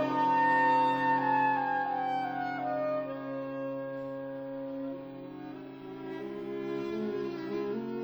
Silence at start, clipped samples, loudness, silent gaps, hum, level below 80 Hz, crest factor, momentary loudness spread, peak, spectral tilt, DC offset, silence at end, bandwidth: 0 s; under 0.1%; -31 LUFS; none; none; -74 dBFS; 14 dB; 17 LU; -16 dBFS; -7 dB/octave; under 0.1%; 0 s; over 20 kHz